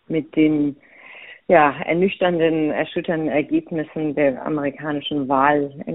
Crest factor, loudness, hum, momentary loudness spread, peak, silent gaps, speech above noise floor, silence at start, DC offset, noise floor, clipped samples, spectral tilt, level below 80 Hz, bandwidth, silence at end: 18 dB; -20 LUFS; none; 9 LU; -2 dBFS; none; 22 dB; 0.1 s; 0.1%; -42 dBFS; under 0.1%; -4.5 dB/octave; -62 dBFS; 4 kHz; 0 s